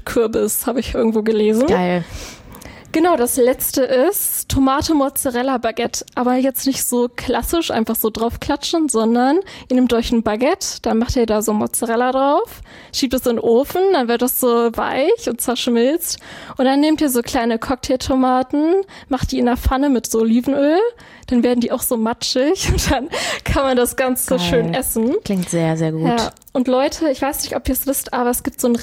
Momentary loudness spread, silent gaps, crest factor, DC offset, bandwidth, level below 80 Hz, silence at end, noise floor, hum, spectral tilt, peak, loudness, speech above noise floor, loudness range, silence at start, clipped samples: 6 LU; none; 14 dB; under 0.1%; 17 kHz; -36 dBFS; 0 s; -37 dBFS; none; -4.5 dB/octave; -4 dBFS; -17 LUFS; 20 dB; 2 LU; 0.05 s; under 0.1%